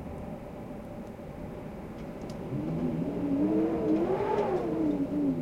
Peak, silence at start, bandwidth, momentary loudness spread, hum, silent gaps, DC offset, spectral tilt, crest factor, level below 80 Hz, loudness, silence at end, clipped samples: -16 dBFS; 0 s; 13.5 kHz; 14 LU; none; none; under 0.1%; -9 dB/octave; 14 dB; -52 dBFS; -31 LUFS; 0 s; under 0.1%